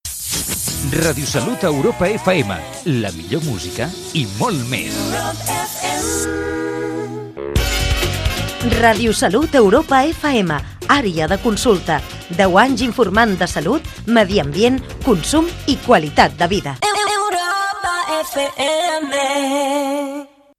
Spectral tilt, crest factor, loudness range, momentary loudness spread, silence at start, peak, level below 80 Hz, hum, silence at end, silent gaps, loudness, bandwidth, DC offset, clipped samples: -4 dB/octave; 18 dB; 5 LU; 9 LU; 0.05 s; 0 dBFS; -32 dBFS; none; 0.3 s; none; -17 LUFS; 15.5 kHz; under 0.1%; under 0.1%